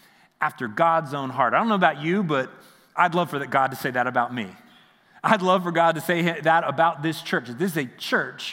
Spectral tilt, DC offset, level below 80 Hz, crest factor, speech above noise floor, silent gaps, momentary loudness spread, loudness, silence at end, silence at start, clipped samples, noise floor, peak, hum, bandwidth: -5.5 dB/octave; under 0.1%; -76 dBFS; 22 dB; 32 dB; none; 8 LU; -23 LUFS; 0 s; 0.4 s; under 0.1%; -55 dBFS; -2 dBFS; none; 16.5 kHz